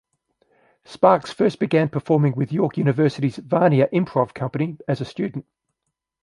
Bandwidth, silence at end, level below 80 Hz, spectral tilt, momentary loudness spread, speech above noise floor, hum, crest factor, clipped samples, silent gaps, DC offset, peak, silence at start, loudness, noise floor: 11 kHz; 0.8 s; -62 dBFS; -8.5 dB/octave; 9 LU; 60 dB; none; 20 dB; under 0.1%; none; under 0.1%; -2 dBFS; 0.9 s; -21 LUFS; -80 dBFS